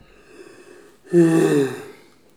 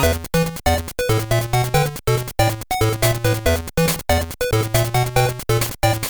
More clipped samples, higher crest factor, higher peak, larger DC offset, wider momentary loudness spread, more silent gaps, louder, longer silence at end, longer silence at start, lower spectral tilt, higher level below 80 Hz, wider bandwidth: neither; about the same, 18 dB vs 16 dB; about the same, -4 dBFS vs -2 dBFS; first, 0.1% vs under 0.1%; first, 11 LU vs 3 LU; neither; about the same, -18 LUFS vs -19 LUFS; first, 0.45 s vs 0 s; first, 0.4 s vs 0 s; first, -7 dB/octave vs -4.5 dB/octave; second, -66 dBFS vs -32 dBFS; second, 14.5 kHz vs over 20 kHz